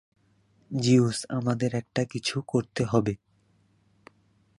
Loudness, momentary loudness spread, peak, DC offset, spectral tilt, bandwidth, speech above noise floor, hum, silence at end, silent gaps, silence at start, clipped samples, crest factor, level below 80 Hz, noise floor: -27 LUFS; 9 LU; -8 dBFS; under 0.1%; -6 dB/octave; 11.5 kHz; 40 dB; none; 1.45 s; none; 0.7 s; under 0.1%; 20 dB; -60 dBFS; -65 dBFS